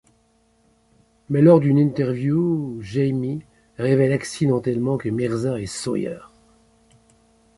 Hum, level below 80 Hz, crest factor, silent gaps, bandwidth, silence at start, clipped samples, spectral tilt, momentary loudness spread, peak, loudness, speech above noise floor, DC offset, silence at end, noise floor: none; -56 dBFS; 20 dB; none; 11.5 kHz; 1.3 s; under 0.1%; -7.5 dB/octave; 12 LU; -2 dBFS; -21 LUFS; 42 dB; under 0.1%; 1.3 s; -61 dBFS